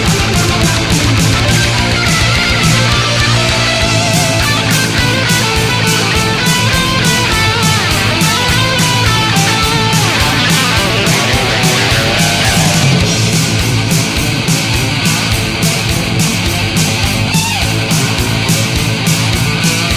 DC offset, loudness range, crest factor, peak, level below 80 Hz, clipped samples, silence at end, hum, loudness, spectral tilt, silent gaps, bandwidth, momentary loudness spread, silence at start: under 0.1%; 2 LU; 12 dB; 0 dBFS; -24 dBFS; under 0.1%; 0 s; none; -10 LUFS; -3.5 dB/octave; none; 16 kHz; 3 LU; 0 s